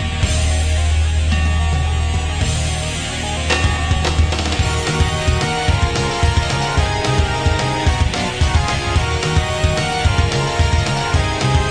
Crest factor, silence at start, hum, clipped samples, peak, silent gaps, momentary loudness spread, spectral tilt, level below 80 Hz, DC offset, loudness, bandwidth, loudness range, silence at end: 14 dB; 0 s; none; under 0.1%; -2 dBFS; none; 2 LU; -4.5 dB/octave; -20 dBFS; under 0.1%; -17 LUFS; 10.5 kHz; 1 LU; 0 s